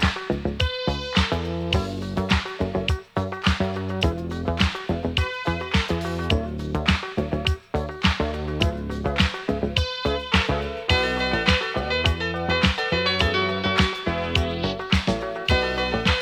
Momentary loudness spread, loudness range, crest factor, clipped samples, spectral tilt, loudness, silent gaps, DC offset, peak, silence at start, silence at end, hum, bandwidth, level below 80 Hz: 6 LU; 3 LU; 22 dB; under 0.1%; -5.5 dB/octave; -24 LUFS; none; under 0.1%; -2 dBFS; 0 s; 0 s; none; 12.5 kHz; -32 dBFS